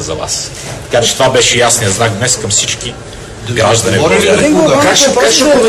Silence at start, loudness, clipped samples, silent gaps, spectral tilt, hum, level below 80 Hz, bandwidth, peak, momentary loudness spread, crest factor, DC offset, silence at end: 0 s; -9 LUFS; under 0.1%; none; -3 dB/octave; none; -36 dBFS; 18 kHz; 0 dBFS; 13 LU; 10 dB; under 0.1%; 0 s